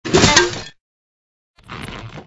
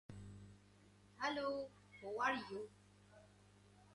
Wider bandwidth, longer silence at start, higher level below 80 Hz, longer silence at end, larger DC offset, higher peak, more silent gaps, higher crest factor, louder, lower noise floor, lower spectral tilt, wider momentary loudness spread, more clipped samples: about the same, 11 kHz vs 11.5 kHz; about the same, 0.05 s vs 0.1 s; first, -38 dBFS vs -74 dBFS; about the same, 0.05 s vs 0 s; neither; first, 0 dBFS vs -26 dBFS; first, 0.80-1.54 s vs none; about the same, 20 dB vs 22 dB; first, -13 LUFS vs -44 LUFS; first, under -90 dBFS vs -67 dBFS; second, -3 dB/octave vs -4.5 dB/octave; about the same, 24 LU vs 26 LU; neither